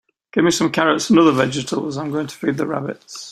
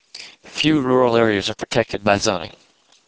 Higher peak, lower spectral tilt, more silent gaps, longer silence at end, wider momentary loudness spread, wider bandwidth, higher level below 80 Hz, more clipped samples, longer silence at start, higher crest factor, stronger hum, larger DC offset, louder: about the same, -2 dBFS vs 0 dBFS; about the same, -4.5 dB/octave vs -4.5 dB/octave; neither; second, 0 s vs 0.6 s; second, 11 LU vs 18 LU; first, 14.5 kHz vs 8 kHz; second, -58 dBFS vs -48 dBFS; neither; first, 0.35 s vs 0.15 s; about the same, 18 dB vs 20 dB; neither; neither; about the same, -18 LUFS vs -18 LUFS